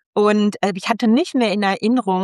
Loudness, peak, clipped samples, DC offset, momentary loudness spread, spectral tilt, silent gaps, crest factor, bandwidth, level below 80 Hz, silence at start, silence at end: -18 LUFS; -2 dBFS; under 0.1%; under 0.1%; 3 LU; -6 dB/octave; none; 16 dB; 12 kHz; -66 dBFS; 0.15 s; 0 s